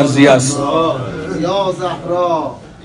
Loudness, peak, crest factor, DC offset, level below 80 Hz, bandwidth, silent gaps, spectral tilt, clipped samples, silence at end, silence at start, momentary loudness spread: -15 LUFS; 0 dBFS; 14 dB; under 0.1%; -46 dBFS; 11 kHz; none; -5 dB/octave; 0.3%; 0 s; 0 s; 12 LU